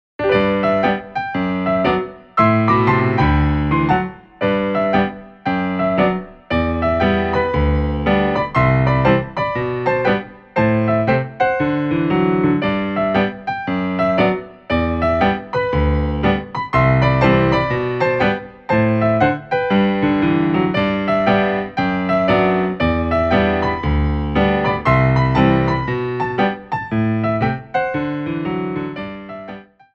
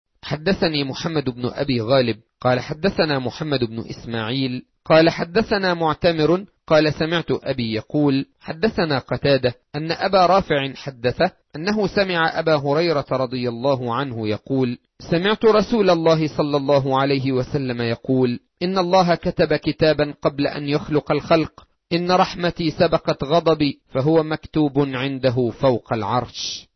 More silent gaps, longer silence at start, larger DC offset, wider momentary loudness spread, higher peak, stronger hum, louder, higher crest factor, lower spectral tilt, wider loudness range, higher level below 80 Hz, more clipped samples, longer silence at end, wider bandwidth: neither; about the same, 0.2 s vs 0.25 s; neither; about the same, 8 LU vs 8 LU; about the same, -2 dBFS vs -4 dBFS; neither; first, -17 LUFS vs -20 LUFS; about the same, 16 dB vs 16 dB; first, -8.5 dB/octave vs -6.5 dB/octave; about the same, 2 LU vs 2 LU; first, -30 dBFS vs -48 dBFS; neither; first, 0.3 s vs 0.15 s; about the same, 6.6 kHz vs 6.4 kHz